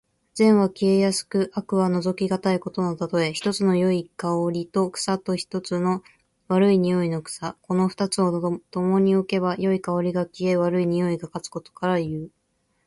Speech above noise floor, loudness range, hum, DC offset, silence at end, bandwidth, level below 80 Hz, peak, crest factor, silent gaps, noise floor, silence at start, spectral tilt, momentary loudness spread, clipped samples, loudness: 48 dB; 2 LU; none; under 0.1%; 0.6 s; 11.5 kHz; -62 dBFS; -6 dBFS; 16 dB; none; -70 dBFS; 0.35 s; -6 dB/octave; 9 LU; under 0.1%; -23 LUFS